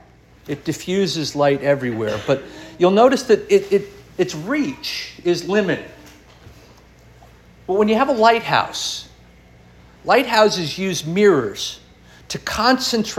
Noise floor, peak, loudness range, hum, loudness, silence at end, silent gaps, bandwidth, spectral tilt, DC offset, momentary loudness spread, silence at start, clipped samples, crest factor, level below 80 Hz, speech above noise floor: -47 dBFS; -2 dBFS; 6 LU; none; -18 LUFS; 0 s; none; 16 kHz; -4.5 dB/octave; under 0.1%; 13 LU; 0.45 s; under 0.1%; 18 dB; -50 dBFS; 29 dB